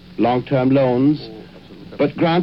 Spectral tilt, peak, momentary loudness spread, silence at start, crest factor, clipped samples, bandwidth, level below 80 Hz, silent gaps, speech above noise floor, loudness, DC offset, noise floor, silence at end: -9.5 dB/octave; -6 dBFS; 20 LU; 0.1 s; 12 dB; under 0.1%; 5.8 kHz; -50 dBFS; none; 23 dB; -18 LUFS; 0.2%; -39 dBFS; 0 s